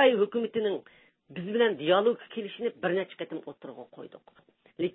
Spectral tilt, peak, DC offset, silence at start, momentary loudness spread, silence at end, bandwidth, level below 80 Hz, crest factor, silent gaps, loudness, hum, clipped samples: -9 dB/octave; -10 dBFS; under 0.1%; 0 s; 21 LU; 0.05 s; 4 kHz; -78 dBFS; 20 dB; none; -29 LUFS; none; under 0.1%